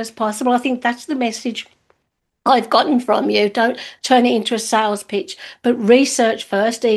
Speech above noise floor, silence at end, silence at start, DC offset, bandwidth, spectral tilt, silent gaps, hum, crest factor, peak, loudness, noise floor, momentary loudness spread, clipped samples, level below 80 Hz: 55 dB; 0 s; 0 s; under 0.1%; 12.5 kHz; -3.5 dB/octave; none; none; 18 dB; 0 dBFS; -17 LUFS; -72 dBFS; 11 LU; under 0.1%; -66 dBFS